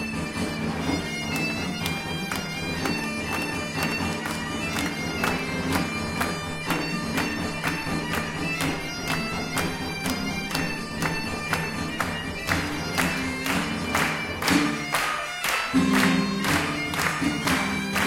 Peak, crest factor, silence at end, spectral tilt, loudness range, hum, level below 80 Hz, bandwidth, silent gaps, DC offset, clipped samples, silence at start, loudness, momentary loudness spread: -6 dBFS; 22 dB; 0 s; -4 dB/octave; 4 LU; none; -46 dBFS; 17 kHz; none; under 0.1%; under 0.1%; 0 s; -26 LUFS; 6 LU